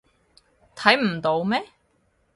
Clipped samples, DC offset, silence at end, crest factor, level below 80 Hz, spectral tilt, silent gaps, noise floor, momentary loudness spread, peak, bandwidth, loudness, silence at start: under 0.1%; under 0.1%; 0.7 s; 26 dB; -64 dBFS; -5 dB/octave; none; -66 dBFS; 8 LU; 0 dBFS; 11.5 kHz; -22 LUFS; 0.75 s